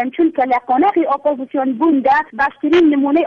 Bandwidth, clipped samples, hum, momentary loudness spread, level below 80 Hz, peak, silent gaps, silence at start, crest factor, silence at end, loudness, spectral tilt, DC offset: 6.6 kHz; under 0.1%; none; 6 LU; -54 dBFS; -4 dBFS; none; 0 s; 10 dB; 0 s; -15 LUFS; -6 dB/octave; under 0.1%